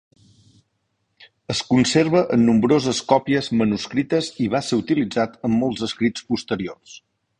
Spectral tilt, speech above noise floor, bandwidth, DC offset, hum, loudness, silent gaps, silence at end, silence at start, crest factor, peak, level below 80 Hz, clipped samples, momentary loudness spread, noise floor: -5.5 dB/octave; 52 dB; 10.5 kHz; under 0.1%; none; -20 LUFS; none; 0.4 s; 1.5 s; 20 dB; -2 dBFS; -54 dBFS; under 0.1%; 10 LU; -72 dBFS